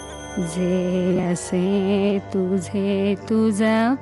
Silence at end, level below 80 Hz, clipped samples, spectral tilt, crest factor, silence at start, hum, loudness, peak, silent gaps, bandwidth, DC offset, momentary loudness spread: 0 s; -50 dBFS; under 0.1%; -6.5 dB/octave; 12 dB; 0 s; none; -21 LUFS; -8 dBFS; none; 12 kHz; under 0.1%; 5 LU